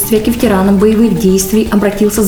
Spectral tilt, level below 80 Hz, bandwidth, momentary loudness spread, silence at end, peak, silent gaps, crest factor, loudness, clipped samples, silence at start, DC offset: -5.5 dB/octave; -28 dBFS; over 20 kHz; 3 LU; 0 s; 0 dBFS; none; 10 dB; -10 LUFS; under 0.1%; 0 s; 0.9%